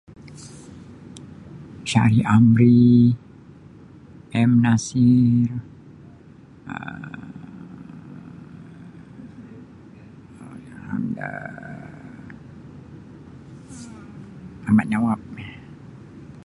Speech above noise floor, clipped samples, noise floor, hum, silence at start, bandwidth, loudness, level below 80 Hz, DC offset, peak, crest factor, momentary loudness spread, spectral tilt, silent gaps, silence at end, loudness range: 29 dB; under 0.1%; -46 dBFS; none; 0.25 s; 11 kHz; -19 LUFS; -52 dBFS; under 0.1%; -4 dBFS; 20 dB; 27 LU; -7 dB/octave; none; 0.25 s; 22 LU